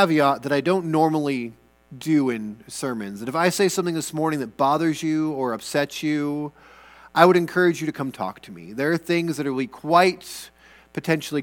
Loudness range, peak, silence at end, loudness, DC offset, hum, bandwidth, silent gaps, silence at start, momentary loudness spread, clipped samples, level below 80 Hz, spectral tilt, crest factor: 3 LU; 0 dBFS; 0 s; -22 LUFS; under 0.1%; none; 18 kHz; none; 0 s; 15 LU; under 0.1%; -64 dBFS; -5 dB/octave; 22 dB